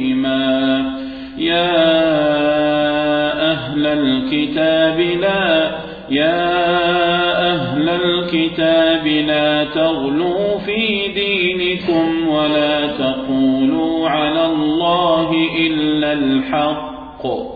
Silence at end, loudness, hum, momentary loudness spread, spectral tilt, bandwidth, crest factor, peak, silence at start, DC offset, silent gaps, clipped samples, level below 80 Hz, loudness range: 0 s; -16 LUFS; none; 4 LU; -8 dB/octave; 4.9 kHz; 12 dB; -4 dBFS; 0 s; under 0.1%; none; under 0.1%; -46 dBFS; 1 LU